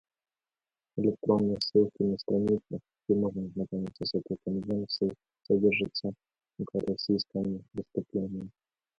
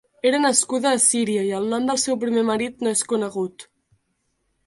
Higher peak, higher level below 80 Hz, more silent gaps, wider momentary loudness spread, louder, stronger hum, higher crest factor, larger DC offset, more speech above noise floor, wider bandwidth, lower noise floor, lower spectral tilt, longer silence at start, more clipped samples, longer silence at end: second, -12 dBFS vs -4 dBFS; about the same, -62 dBFS vs -64 dBFS; neither; first, 11 LU vs 7 LU; second, -31 LUFS vs -21 LUFS; neither; about the same, 20 dB vs 20 dB; neither; first, over 60 dB vs 51 dB; second, 7.4 kHz vs 11.5 kHz; first, under -90 dBFS vs -72 dBFS; first, -7.5 dB/octave vs -2.5 dB/octave; first, 0.95 s vs 0.25 s; neither; second, 0.5 s vs 1.05 s